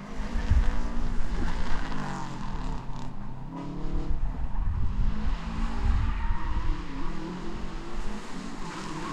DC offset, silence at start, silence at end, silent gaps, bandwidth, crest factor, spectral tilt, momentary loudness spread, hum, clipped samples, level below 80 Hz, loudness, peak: under 0.1%; 0 s; 0 s; none; 8.4 kHz; 16 dB; -6.5 dB/octave; 9 LU; none; under 0.1%; -30 dBFS; -34 LUFS; -10 dBFS